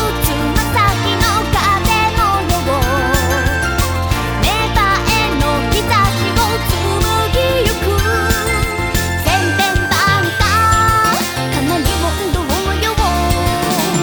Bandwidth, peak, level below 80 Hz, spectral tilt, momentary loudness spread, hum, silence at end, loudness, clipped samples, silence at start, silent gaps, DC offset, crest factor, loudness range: over 20 kHz; 0 dBFS; -22 dBFS; -4 dB/octave; 4 LU; none; 0 s; -14 LUFS; under 0.1%; 0 s; none; under 0.1%; 14 dB; 1 LU